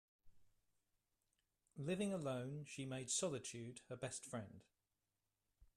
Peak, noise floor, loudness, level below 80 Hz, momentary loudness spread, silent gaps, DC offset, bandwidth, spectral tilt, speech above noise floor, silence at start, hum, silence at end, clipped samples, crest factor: -28 dBFS; under -90 dBFS; -46 LUFS; -80 dBFS; 12 LU; none; under 0.1%; 13.5 kHz; -4 dB/octave; over 44 dB; 0.25 s; none; 0.15 s; under 0.1%; 20 dB